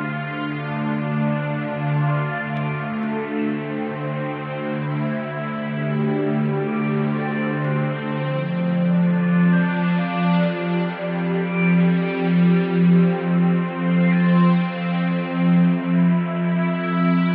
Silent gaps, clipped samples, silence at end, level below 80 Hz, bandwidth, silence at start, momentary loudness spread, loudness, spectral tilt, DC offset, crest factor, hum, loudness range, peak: none; under 0.1%; 0 s; -66 dBFS; 4.4 kHz; 0 s; 9 LU; -21 LUFS; -11.5 dB/octave; under 0.1%; 12 dB; none; 6 LU; -8 dBFS